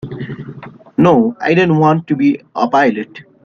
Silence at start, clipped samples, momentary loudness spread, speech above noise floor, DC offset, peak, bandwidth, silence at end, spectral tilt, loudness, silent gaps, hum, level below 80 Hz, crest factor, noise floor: 0.05 s; under 0.1%; 16 LU; 21 dB; under 0.1%; 0 dBFS; 7 kHz; 0.25 s; -8 dB/octave; -13 LUFS; none; none; -52 dBFS; 14 dB; -33 dBFS